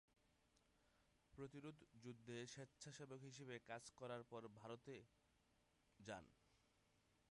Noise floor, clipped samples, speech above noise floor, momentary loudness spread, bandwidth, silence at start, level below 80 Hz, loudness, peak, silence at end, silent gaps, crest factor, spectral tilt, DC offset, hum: -82 dBFS; under 0.1%; 24 dB; 6 LU; 11 kHz; 0.1 s; -84 dBFS; -58 LUFS; -40 dBFS; 0.15 s; none; 20 dB; -4.5 dB/octave; under 0.1%; none